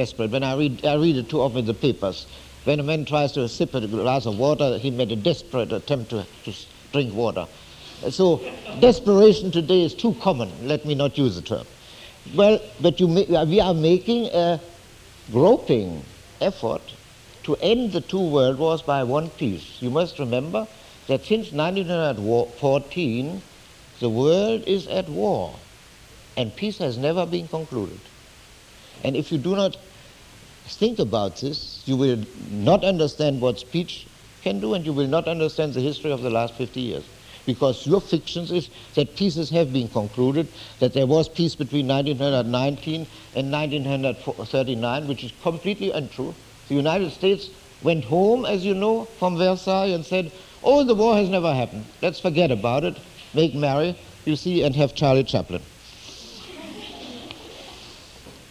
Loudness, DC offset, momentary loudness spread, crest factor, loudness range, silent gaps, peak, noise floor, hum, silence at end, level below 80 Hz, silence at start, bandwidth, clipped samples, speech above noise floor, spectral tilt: -22 LUFS; under 0.1%; 15 LU; 20 dB; 6 LU; none; -2 dBFS; -48 dBFS; none; 0.1 s; -50 dBFS; 0 s; 16 kHz; under 0.1%; 26 dB; -6.5 dB/octave